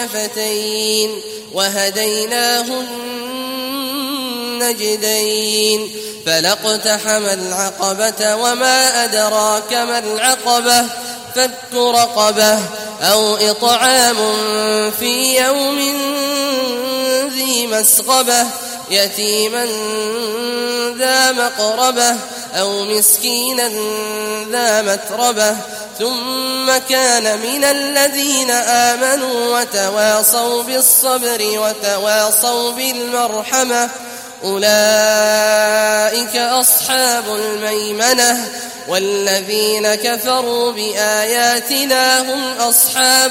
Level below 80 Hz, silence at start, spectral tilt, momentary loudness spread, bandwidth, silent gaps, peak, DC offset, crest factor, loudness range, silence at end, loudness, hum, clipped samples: -62 dBFS; 0 s; -0.5 dB/octave; 9 LU; 16.5 kHz; none; 0 dBFS; under 0.1%; 16 dB; 4 LU; 0 s; -14 LUFS; none; under 0.1%